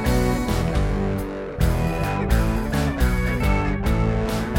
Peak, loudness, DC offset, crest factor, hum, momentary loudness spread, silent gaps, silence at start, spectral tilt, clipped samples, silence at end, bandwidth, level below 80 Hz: -6 dBFS; -23 LUFS; under 0.1%; 14 dB; none; 3 LU; none; 0 s; -6.5 dB/octave; under 0.1%; 0 s; 17 kHz; -24 dBFS